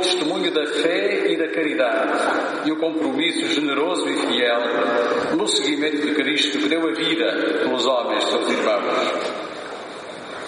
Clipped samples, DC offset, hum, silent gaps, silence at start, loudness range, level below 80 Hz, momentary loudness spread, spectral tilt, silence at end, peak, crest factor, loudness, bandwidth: under 0.1%; under 0.1%; none; none; 0 s; 1 LU; -70 dBFS; 4 LU; -2.5 dB/octave; 0 s; -4 dBFS; 16 dB; -20 LUFS; 10.5 kHz